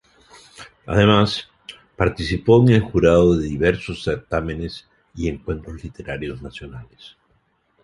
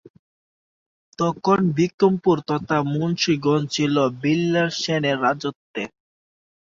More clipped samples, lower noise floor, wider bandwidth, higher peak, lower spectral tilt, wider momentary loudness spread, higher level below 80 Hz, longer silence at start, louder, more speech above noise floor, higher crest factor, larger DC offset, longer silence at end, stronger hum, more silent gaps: neither; second, -64 dBFS vs under -90 dBFS; first, 11.5 kHz vs 7.6 kHz; about the same, -2 dBFS vs -4 dBFS; first, -7 dB/octave vs -5.5 dB/octave; first, 24 LU vs 9 LU; first, -38 dBFS vs -60 dBFS; second, 0.6 s vs 1.2 s; about the same, -19 LUFS vs -21 LUFS; second, 45 dB vs over 70 dB; about the same, 18 dB vs 18 dB; neither; second, 0.75 s vs 0.9 s; neither; second, none vs 1.94-1.98 s, 5.56-5.74 s